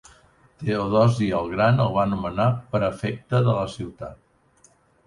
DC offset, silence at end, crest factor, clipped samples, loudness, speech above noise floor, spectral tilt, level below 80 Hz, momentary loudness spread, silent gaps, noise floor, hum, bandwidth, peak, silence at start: under 0.1%; 0.9 s; 18 dB; under 0.1%; -23 LUFS; 37 dB; -7.5 dB/octave; -48 dBFS; 13 LU; none; -59 dBFS; none; 11 kHz; -6 dBFS; 0.6 s